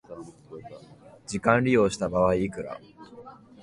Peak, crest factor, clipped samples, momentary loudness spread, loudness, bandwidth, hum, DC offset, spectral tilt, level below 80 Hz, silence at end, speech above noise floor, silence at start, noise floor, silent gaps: -6 dBFS; 22 dB; under 0.1%; 24 LU; -24 LUFS; 11.5 kHz; none; under 0.1%; -6 dB/octave; -52 dBFS; 0.3 s; 27 dB; 0.1 s; -51 dBFS; none